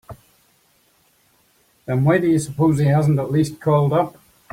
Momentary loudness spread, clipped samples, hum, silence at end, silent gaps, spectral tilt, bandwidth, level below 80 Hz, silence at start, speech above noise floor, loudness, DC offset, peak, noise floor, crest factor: 7 LU; under 0.1%; none; 0.4 s; none; -7.5 dB/octave; 15.5 kHz; -54 dBFS; 0.1 s; 43 dB; -18 LUFS; under 0.1%; -4 dBFS; -60 dBFS; 16 dB